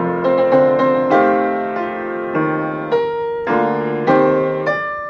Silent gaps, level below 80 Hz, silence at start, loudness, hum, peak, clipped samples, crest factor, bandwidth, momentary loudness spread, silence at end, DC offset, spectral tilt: none; -54 dBFS; 0 s; -16 LUFS; none; -4 dBFS; under 0.1%; 14 dB; 6.4 kHz; 8 LU; 0 s; under 0.1%; -8 dB/octave